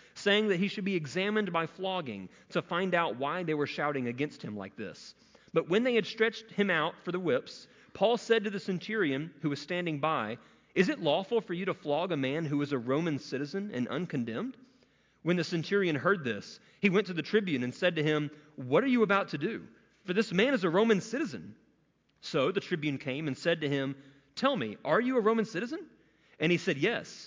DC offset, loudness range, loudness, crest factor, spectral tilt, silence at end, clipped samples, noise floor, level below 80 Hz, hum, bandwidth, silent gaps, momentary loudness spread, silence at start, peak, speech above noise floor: under 0.1%; 4 LU; -31 LUFS; 18 dB; -6 dB/octave; 0 s; under 0.1%; -71 dBFS; -74 dBFS; none; 7.6 kHz; none; 12 LU; 0.15 s; -12 dBFS; 40 dB